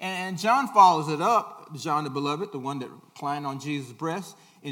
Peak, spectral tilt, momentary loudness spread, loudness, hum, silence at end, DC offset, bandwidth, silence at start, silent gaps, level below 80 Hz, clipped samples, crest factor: -4 dBFS; -5 dB/octave; 18 LU; -25 LUFS; none; 0 s; under 0.1%; 17.5 kHz; 0 s; none; -82 dBFS; under 0.1%; 20 dB